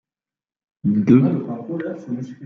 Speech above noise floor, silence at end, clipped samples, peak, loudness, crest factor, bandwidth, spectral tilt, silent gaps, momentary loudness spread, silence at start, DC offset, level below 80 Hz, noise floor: over 71 dB; 0 s; under 0.1%; -2 dBFS; -20 LUFS; 18 dB; 6.4 kHz; -10 dB/octave; none; 14 LU; 0.85 s; under 0.1%; -60 dBFS; under -90 dBFS